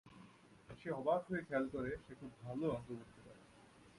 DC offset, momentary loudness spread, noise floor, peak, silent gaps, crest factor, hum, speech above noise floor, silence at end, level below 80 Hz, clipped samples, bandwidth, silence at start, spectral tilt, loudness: under 0.1%; 24 LU; -64 dBFS; -24 dBFS; none; 20 dB; none; 22 dB; 0 s; -68 dBFS; under 0.1%; 11.5 kHz; 0.05 s; -7.5 dB/octave; -42 LUFS